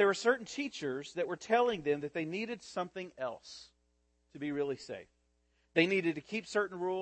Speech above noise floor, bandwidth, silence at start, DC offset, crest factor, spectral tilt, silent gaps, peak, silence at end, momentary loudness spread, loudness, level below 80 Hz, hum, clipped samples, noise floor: 41 dB; 8.8 kHz; 0 s; under 0.1%; 20 dB; -4.5 dB/octave; none; -14 dBFS; 0 s; 13 LU; -35 LUFS; -74 dBFS; none; under 0.1%; -75 dBFS